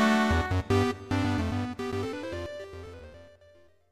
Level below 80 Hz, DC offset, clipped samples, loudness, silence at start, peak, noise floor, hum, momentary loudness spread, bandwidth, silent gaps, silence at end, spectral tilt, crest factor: -44 dBFS; under 0.1%; under 0.1%; -29 LUFS; 0 s; -12 dBFS; -59 dBFS; none; 19 LU; 15 kHz; none; 0.65 s; -6 dB/octave; 18 dB